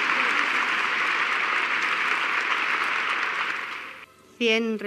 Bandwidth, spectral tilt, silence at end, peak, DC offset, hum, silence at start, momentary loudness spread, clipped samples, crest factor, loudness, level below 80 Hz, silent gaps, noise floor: 13.5 kHz; -2 dB/octave; 0 s; -6 dBFS; under 0.1%; none; 0 s; 6 LU; under 0.1%; 18 dB; -23 LUFS; -80 dBFS; none; -46 dBFS